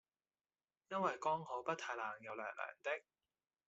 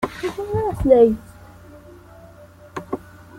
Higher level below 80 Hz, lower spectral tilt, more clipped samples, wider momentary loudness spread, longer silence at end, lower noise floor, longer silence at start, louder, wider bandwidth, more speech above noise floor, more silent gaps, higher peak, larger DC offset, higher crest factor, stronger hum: second, under -90 dBFS vs -40 dBFS; second, -2.5 dB/octave vs -7.5 dB/octave; neither; second, 7 LU vs 19 LU; first, 0.65 s vs 0.4 s; first, under -90 dBFS vs -45 dBFS; first, 0.9 s vs 0 s; second, -43 LUFS vs -19 LUFS; second, 8 kHz vs 15 kHz; first, over 47 dB vs 28 dB; neither; second, -24 dBFS vs -2 dBFS; neither; about the same, 20 dB vs 20 dB; neither